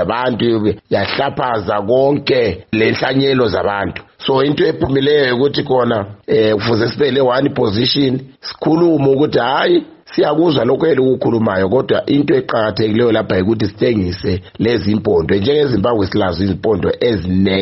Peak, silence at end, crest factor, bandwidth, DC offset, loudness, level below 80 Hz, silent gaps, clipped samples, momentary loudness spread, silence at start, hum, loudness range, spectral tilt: -2 dBFS; 0 s; 12 dB; 6 kHz; under 0.1%; -15 LUFS; -44 dBFS; none; under 0.1%; 5 LU; 0 s; none; 1 LU; -5 dB/octave